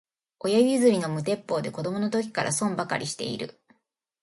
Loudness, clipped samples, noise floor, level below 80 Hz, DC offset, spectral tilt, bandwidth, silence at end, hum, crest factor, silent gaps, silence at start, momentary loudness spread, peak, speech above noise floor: -26 LUFS; under 0.1%; -75 dBFS; -70 dBFS; under 0.1%; -4.5 dB/octave; 11.5 kHz; 0.7 s; none; 18 dB; none; 0.45 s; 11 LU; -8 dBFS; 49 dB